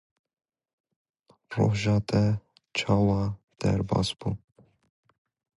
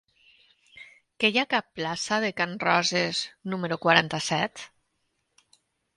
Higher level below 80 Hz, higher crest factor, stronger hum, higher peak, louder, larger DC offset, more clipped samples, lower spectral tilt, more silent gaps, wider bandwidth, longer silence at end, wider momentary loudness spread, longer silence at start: first, -48 dBFS vs -70 dBFS; second, 20 dB vs 26 dB; neither; second, -8 dBFS vs -2 dBFS; about the same, -27 LUFS vs -25 LUFS; neither; neither; first, -6.5 dB/octave vs -3.5 dB/octave; first, 3.44-3.48 s vs none; about the same, 11 kHz vs 11.5 kHz; about the same, 1.2 s vs 1.3 s; about the same, 10 LU vs 11 LU; first, 1.5 s vs 0.75 s